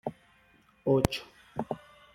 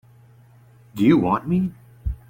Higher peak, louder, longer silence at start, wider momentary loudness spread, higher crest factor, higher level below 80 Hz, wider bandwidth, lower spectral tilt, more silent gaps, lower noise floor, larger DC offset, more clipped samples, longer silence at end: about the same, -4 dBFS vs -4 dBFS; second, -32 LUFS vs -21 LUFS; second, 0.05 s vs 0.95 s; about the same, 15 LU vs 16 LU; first, 28 dB vs 18 dB; second, -52 dBFS vs -38 dBFS; about the same, 16 kHz vs 16.5 kHz; second, -6 dB/octave vs -8.5 dB/octave; neither; first, -63 dBFS vs -51 dBFS; neither; neither; first, 0.4 s vs 0.15 s